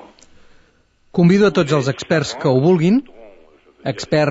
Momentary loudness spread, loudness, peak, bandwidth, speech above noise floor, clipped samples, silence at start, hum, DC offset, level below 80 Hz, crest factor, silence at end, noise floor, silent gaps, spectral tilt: 12 LU; -16 LUFS; -4 dBFS; 8 kHz; 41 dB; under 0.1%; 1.15 s; none; under 0.1%; -52 dBFS; 14 dB; 0 s; -56 dBFS; none; -6.5 dB/octave